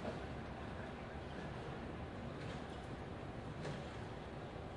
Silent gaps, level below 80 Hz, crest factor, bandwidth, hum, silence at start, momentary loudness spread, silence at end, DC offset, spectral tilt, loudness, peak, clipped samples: none; -58 dBFS; 14 dB; 11 kHz; none; 0 s; 2 LU; 0 s; under 0.1%; -6.5 dB/octave; -48 LUFS; -34 dBFS; under 0.1%